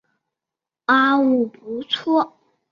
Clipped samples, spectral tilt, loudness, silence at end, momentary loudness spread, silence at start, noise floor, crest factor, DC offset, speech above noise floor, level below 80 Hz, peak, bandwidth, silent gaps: under 0.1%; -5 dB/octave; -19 LUFS; 0.45 s; 13 LU; 0.9 s; -87 dBFS; 18 dB; under 0.1%; 69 dB; -70 dBFS; -4 dBFS; 7 kHz; none